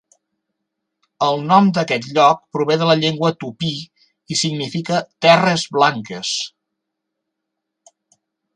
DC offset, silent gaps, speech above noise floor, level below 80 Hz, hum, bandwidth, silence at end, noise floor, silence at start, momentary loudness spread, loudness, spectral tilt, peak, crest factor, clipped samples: under 0.1%; none; 62 dB; -64 dBFS; none; 11 kHz; 2.1 s; -79 dBFS; 1.2 s; 11 LU; -17 LUFS; -4.5 dB/octave; 0 dBFS; 18 dB; under 0.1%